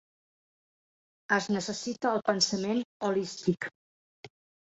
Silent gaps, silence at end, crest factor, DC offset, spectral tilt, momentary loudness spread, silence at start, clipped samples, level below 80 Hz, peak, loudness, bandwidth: 2.85-3.00 s, 3.75-4.23 s; 0.4 s; 22 dB; under 0.1%; -3.5 dB/octave; 6 LU; 1.3 s; under 0.1%; -72 dBFS; -10 dBFS; -30 LUFS; 8 kHz